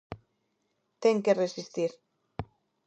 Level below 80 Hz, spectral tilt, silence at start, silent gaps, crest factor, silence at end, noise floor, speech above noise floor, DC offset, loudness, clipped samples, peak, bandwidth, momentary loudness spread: -60 dBFS; -5.5 dB/octave; 0.1 s; none; 20 dB; 0.45 s; -77 dBFS; 50 dB; under 0.1%; -29 LUFS; under 0.1%; -10 dBFS; 8.4 kHz; 22 LU